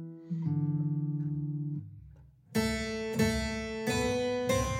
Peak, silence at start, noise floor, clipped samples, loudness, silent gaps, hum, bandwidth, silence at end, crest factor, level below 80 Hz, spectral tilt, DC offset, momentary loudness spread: -16 dBFS; 0 s; -55 dBFS; under 0.1%; -32 LUFS; none; none; 16 kHz; 0 s; 18 dB; -48 dBFS; -5.5 dB/octave; under 0.1%; 9 LU